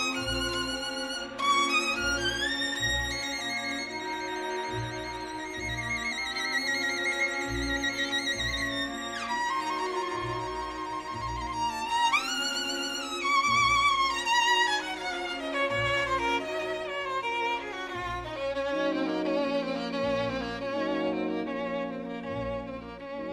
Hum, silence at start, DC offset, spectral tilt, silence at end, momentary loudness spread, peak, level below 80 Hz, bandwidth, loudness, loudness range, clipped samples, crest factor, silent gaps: none; 0 s; under 0.1%; -3 dB/octave; 0 s; 10 LU; -14 dBFS; -50 dBFS; 16 kHz; -29 LUFS; 6 LU; under 0.1%; 16 dB; none